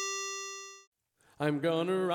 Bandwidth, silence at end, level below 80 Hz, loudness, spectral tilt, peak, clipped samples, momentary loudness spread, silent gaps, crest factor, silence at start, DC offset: 18.5 kHz; 0 s; -80 dBFS; -33 LUFS; -4 dB/octave; -20 dBFS; under 0.1%; 17 LU; 0.87-0.92 s; 14 dB; 0 s; under 0.1%